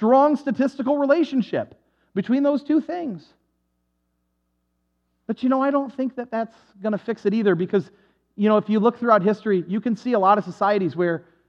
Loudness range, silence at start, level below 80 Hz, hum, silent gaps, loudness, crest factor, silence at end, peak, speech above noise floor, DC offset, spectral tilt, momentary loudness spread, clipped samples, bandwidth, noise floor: 7 LU; 0 s; -74 dBFS; none; none; -22 LUFS; 18 dB; 0.3 s; -4 dBFS; 51 dB; under 0.1%; -8 dB/octave; 11 LU; under 0.1%; 7.6 kHz; -72 dBFS